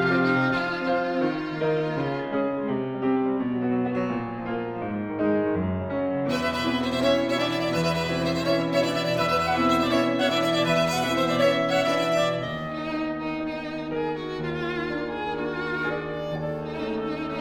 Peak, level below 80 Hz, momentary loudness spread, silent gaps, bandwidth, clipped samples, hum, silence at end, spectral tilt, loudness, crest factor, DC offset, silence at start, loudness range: -10 dBFS; -54 dBFS; 8 LU; none; 20 kHz; under 0.1%; none; 0 s; -5.5 dB/octave; -25 LUFS; 16 dB; under 0.1%; 0 s; 7 LU